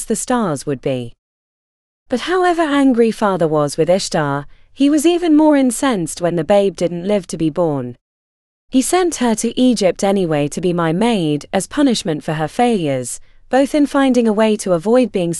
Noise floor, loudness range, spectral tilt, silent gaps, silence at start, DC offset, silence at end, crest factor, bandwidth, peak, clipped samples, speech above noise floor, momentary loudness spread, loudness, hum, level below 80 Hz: under -90 dBFS; 3 LU; -5 dB/octave; 1.18-2.06 s, 8.01-8.68 s; 0 s; under 0.1%; 0 s; 14 dB; 13.5 kHz; -2 dBFS; under 0.1%; over 75 dB; 8 LU; -16 LUFS; none; -44 dBFS